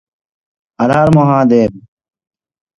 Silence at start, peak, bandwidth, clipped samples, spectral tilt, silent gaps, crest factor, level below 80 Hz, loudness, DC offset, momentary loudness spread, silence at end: 0.8 s; 0 dBFS; 10.5 kHz; under 0.1%; -8.5 dB/octave; none; 14 dB; -44 dBFS; -11 LUFS; under 0.1%; 8 LU; 1 s